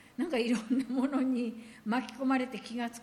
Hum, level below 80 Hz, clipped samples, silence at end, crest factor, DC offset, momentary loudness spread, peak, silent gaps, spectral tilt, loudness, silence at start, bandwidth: none; -72 dBFS; under 0.1%; 0 s; 14 dB; under 0.1%; 7 LU; -18 dBFS; none; -5 dB/octave; -32 LUFS; 0.2 s; 12.5 kHz